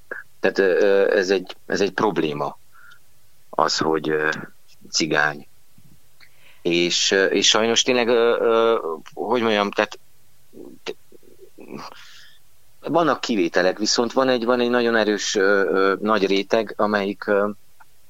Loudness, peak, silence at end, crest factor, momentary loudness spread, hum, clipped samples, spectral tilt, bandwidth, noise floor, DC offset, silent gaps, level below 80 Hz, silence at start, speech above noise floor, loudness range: -20 LUFS; 0 dBFS; 0.55 s; 20 dB; 13 LU; none; under 0.1%; -3 dB/octave; 16 kHz; -59 dBFS; 0.8%; none; -66 dBFS; 0.1 s; 40 dB; 8 LU